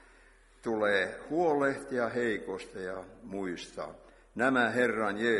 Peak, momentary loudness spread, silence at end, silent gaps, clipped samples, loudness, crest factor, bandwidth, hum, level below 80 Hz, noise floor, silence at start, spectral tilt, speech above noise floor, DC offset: -12 dBFS; 15 LU; 0 s; none; under 0.1%; -31 LUFS; 18 dB; 11.5 kHz; none; -64 dBFS; -60 dBFS; 0.65 s; -5 dB/octave; 29 dB; under 0.1%